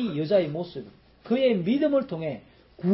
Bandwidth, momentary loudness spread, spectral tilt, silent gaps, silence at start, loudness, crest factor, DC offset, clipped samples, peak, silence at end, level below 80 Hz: 5.8 kHz; 14 LU; -11.5 dB/octave; none; 0 s; -26 LUFS; 14 dB; under 0.1%; under 0.1%; -12 dBFS; 0 s; -62 dBFS